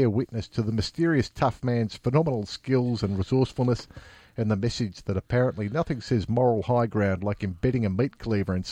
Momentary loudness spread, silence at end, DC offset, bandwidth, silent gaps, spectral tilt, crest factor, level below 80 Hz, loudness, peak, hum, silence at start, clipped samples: 6 LU; 0 s; under 0.1%; 9.6 kHz; none; -7.5 dB/octave; 18 dB; -48 dBFS; -26 LUFS; -8 dBFS; none; 0 s; under 0.1%